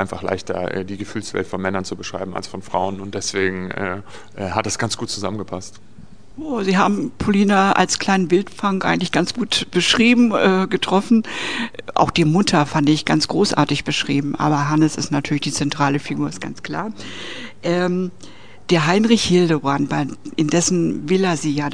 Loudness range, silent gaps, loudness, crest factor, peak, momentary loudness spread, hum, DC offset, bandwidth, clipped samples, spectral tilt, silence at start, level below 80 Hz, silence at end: 8 LU; none; -19 LUFS; 20 dB; 0 dBFS; 13 LU; none; 1%; 10 kHz; under 0.1%; -4.5 dB/octave; 0 s; -50 dBFS; 0 s